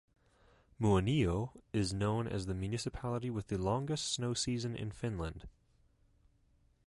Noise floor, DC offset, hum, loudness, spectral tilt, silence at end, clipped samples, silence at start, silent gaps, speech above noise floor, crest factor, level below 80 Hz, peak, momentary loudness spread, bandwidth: -70 dBFS; under 0.1%; none; -36 LUFS; -5.5 dB/octave; 1.35 s; under 0.1%; 0.8 s; none; 35 dB; 18 dB; -52 dBFS; -18 dBFS; 8 LU; 11.5 kHz